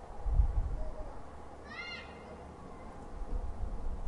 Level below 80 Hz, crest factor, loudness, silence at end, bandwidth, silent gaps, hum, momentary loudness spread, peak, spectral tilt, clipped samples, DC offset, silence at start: -38 dBFS; 20 dB; -41 LUFS; 0 s; 10 kHz; none; none; 15 LU; -16 dBFS; -6.5 dB/octave; under 0.1%; under 0.1%; 0 s